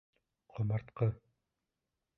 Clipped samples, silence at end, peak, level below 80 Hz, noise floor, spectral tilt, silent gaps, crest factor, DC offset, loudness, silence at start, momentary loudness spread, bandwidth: under 0.1%; 1.05 s; -20 dBFS; -64 dBFS; -88 dBFS; -11 dB/octave; none; 20 dB; under 0.1%; -37 LUFS; 0.55 s; 16 LU; 4.1 kHz